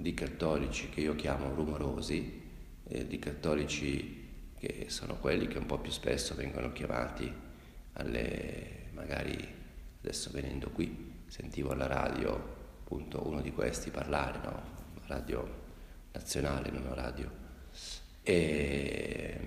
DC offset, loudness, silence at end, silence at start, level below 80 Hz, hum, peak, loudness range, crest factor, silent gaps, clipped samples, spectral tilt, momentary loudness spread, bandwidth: under 0.1%; -37 LUFS; 0 s; 0 s; -46 dBFS; none; -16 dBFS; 4 LU; 22 dB; none; under 0.1%; -5 dB/octave; 15 LU; 15.5 kHz